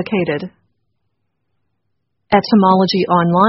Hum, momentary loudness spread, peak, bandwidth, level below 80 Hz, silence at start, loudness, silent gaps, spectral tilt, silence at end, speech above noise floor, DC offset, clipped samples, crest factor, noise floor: none; 11 LU; 0 dBFS; 6 kHz; -54 dBFS; 0 s; -14 LUFS; none; -5 dB/octave; 0 s; 59 dB; under 0.1%; under 0.1%; 16 dB; -72 dBFS